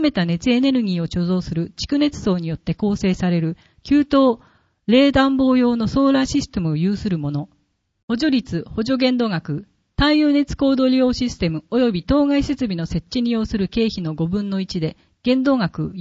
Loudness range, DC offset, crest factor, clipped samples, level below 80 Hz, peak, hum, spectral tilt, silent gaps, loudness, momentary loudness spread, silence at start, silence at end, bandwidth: 4 LU; under 0.1%; 16 dB; under 0.1%; -40 dBFS; -2 dBFS; none; -6.5 dB/octave; 8.03-8.08 s; -19 LUFS; 10 LU; 0 s; 0 s; 8 kHz